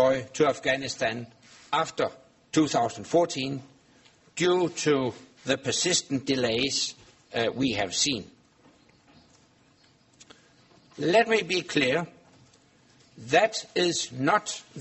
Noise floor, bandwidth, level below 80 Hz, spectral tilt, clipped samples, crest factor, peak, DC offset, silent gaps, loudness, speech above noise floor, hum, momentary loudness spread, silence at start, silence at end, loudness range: -61 dBFS; 8.4 kHz; -64 dBFS; -3.5 dB/octave; under 0.1%; 20 dB; -8 dBFS; under 0.1%; none; -26 LUFS; 35 dB; none; 10 LU; 0 s; 0 s; 5 LU